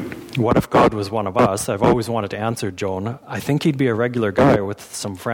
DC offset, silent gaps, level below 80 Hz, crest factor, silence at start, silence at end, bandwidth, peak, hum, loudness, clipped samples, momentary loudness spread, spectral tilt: under 0.1%; none; -44 dBFS; 14 dB; 0 s; 0 s; 19 kHz; -6 dBFS; none; -20 LUFS; under 0.1%; 11 LU; -6 dB/octave